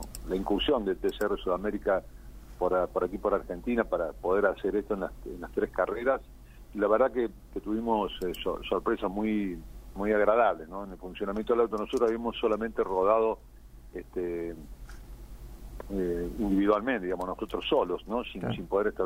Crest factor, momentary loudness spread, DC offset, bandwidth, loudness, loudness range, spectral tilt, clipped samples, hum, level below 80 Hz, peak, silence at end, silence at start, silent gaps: 20 dB; 15 LU; under 0.1%; 16 kHz; -30 LUFS; 3 LU; -6 dB/octave; under 0.1%; none; -46 dBFS; -10 dBFS; 0 s; 0 s; none